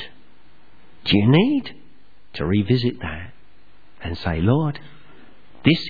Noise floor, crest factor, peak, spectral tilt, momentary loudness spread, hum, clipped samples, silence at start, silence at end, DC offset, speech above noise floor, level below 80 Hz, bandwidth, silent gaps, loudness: -56 dBFS; 22 dB; -2 dBFS; -8.5 dB/octave; 21 LU; none; under 0.1%; 0 s; 0 s; 1%; 37 dB; -44 dBFS; 5 kHz; none; -21 LUFS